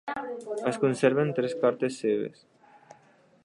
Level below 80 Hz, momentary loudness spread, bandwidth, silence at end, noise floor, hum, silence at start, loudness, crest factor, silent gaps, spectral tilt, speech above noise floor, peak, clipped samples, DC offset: -76 dBFS; 11 LU; 11 kHz; 1.15 s; -60 dBFS; none; 0.05 s; -28 LUFS; 20 dB; none; -6 dB/octave; 33 dB; -8 dBFS; under 0.1%; under 0.1%